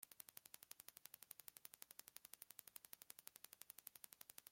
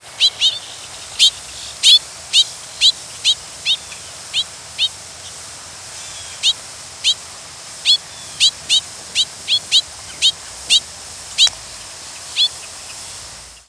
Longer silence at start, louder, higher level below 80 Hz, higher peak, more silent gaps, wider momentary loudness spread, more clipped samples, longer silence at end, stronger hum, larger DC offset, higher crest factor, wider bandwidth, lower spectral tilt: about the same, 0 s vs 0.05 s; second, -60 LUFS vs -15 LUFS; second, under -90 dBFS vs -54 dBFS; second, -28 dBFS vs 0 dBFS; neither; second, 2 LU vs 18 LU; neither; second, 0 s vs 0.2 s; neither; neither; first, 34 dB vs 20 dB; first, 17 kHz vs 11 kHz; first, 0.5 dB/octave vs 2 dB/octave